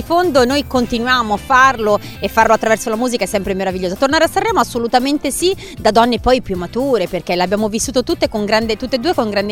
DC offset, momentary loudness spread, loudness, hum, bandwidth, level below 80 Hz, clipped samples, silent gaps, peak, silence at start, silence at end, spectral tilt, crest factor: under 0.1%; 6 LU; -15 LUFS; none; 17.5 kHz; -36 dBFS; under 0.1%; none; 0 dBFS; 0 s; 0 s; -4 dB/octave; 16 dB